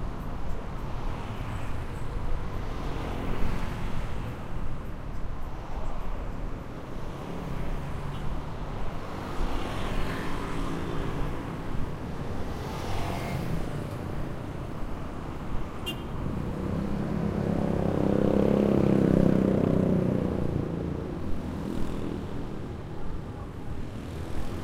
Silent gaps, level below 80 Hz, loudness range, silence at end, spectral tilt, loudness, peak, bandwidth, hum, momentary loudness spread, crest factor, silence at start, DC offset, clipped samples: none; -36 dBFS; 12 LU; 0 s; -7.5 dB/octave; -32 LUFS; -8 dBFS; 14.5 kHz; none; 14 LU; 22 dB; 0 s; under 0.1%; under 0.1%